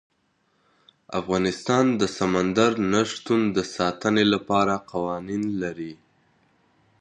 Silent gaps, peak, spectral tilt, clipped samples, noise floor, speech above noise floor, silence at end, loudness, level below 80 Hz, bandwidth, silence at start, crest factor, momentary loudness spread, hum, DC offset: none; -6 dBFS; -5 dB/octave; under 0.1%; -68 dBFS; 45 dB; 1.05 s; -23 LUFS; -56 dBFS; 10 kHz; 1.1 s; 20 dB; 9 LU; none; under 0.1%